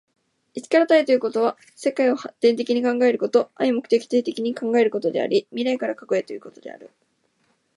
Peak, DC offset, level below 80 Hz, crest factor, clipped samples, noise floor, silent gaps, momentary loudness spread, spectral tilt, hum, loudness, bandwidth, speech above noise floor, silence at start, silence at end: -4 dBFS; under 0.1%; -78 dBFS; 18 dB; under 0.1%; -67 dBFS; none; 15 LU; -5 dB/octave; none; -21 LUFS; 11.5 kHz; 46 dB; 0.55 s; 0.9 s